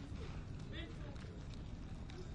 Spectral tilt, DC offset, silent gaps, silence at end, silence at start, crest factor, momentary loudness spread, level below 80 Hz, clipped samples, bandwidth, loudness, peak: -6.5 dB/octave; under 0.1%; none; 0 s; 0 s; 14 dB; 2 LU; -52 dBFS; under 0.1%; 11 kHz; -50 LUFS; -34 dBFS